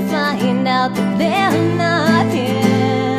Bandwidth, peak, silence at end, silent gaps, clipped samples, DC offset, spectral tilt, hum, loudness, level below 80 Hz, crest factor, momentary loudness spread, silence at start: 15.5 kHz; 0 dBFS; 0 s; none; under 0.1%; under 0.1%; -6 dB/octave; none; -16 LUFS; -56 dBFS; 14 dB; 3 LU; 0 s